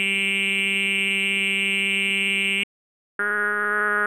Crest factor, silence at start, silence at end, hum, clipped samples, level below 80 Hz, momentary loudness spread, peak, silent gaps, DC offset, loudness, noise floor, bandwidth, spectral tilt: 12 dB; 0 s; 0 s; none; under 0.1%; -70 dBFS; 5 LU; -10 dBFS; 2.63-3.19 s; under 0.1%; -21 LUFS; under -90 dBFS; 15 kHz; -2 dB/octave